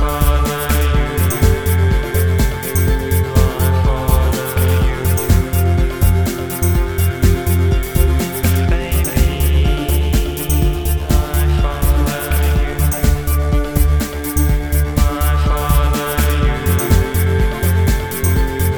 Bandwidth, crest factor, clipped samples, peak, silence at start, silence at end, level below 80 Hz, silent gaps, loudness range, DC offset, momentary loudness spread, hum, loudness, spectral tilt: over 20 kHz; 14 dB; under 0.1%; 0 dBFS; 0 s; 0 s; -16 dBFS; none; 1 LU; under 0.1%; 2 LU; none; -16 LUFS; -5.5 dB/octave